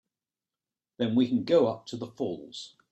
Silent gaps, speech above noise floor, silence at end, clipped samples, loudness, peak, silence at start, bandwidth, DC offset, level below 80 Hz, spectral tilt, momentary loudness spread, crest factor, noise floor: none; over 62 dB; 0.25 s; under 0.1%; -28 LUFS; -12 dBFS; 1 s; 8.6 kHz; under 0.1%; -70 dBFS; -6.5 dB/octave; 16 LU; 18 dB; under -90 dBFS